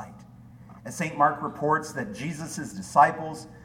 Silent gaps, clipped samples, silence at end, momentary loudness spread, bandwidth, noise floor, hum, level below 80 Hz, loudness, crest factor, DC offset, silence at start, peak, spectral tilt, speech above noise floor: none; under 0.1%; 0 s; 17 LU; 16 kHz; -48 dBFS; none; -60 dBFS; -26 LUFS; 22 dB; under 0.1%; 0 s; -4 dBFS; -5 dB/octave; 22 dB